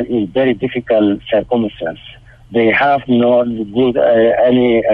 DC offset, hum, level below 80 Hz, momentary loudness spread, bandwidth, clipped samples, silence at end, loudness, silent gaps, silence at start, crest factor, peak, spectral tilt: under 0.1%; none; -44 dBFS; 9 LU; 4.9 kHz; under 0.1%; 0 s; -14 LUFS; none; 0 s; 10 dB; -2 dBFS; -8.5 dB/octave